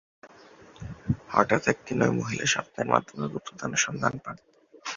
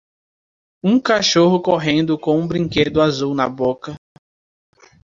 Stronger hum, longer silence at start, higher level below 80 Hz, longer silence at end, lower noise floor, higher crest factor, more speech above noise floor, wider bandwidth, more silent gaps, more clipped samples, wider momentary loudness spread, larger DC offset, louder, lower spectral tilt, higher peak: neither; second, 0.25 s vs 0.85 s; about the same, -54 dBFS vs -50 dBFS; second, 0 s vs 1.15 s; second, -52 dBFS vs under -90 dBFS; first, 26 dB vs 16 dB; second, 25 dB vs over 73 dB; about the same, 7.6 kHz vs 7.6 kHz; neither; neither; first, 16 LU vs 8 LU; neither; second, -27 LUFS vs -17 LUFS; about the same, -4 dB/octave vs -5 dB/octave; about the same, -2 dBFS vs -2 dBFS